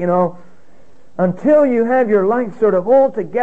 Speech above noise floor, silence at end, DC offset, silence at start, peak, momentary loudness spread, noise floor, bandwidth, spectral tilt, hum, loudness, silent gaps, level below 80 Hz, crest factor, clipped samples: 37 dB; 0 s; 2%; 0 s; -2 dBFS; 7 LU; -51 dBFS; 3.8 kHz; -9.5 dB/octave; none; -15 LUFS; none; -60 dBFS; 12 dB; under 0.1%